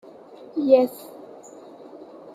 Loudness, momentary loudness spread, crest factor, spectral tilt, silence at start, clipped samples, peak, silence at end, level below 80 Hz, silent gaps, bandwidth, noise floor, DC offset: -21 LUFS; 26 LU; 22 dB; -5.5 dB/octave; 0.55 s; under 0.1%; -4 dBFS; 0 s; -76 dBFS; none; 16 kHz; -44 dBFS; under 0.1%